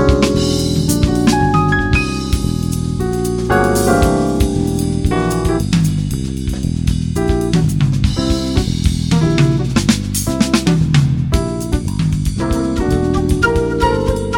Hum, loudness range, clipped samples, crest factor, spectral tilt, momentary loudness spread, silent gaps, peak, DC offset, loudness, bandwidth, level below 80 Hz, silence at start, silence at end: none; 2 LU; under 0.1%; 14 dB; -6 dB/octave; 5 LU; none; 0 dBFS; under 0.1%; -15 LUFS; 19.5 kHz; -24 dBFS; 0 s; 0 s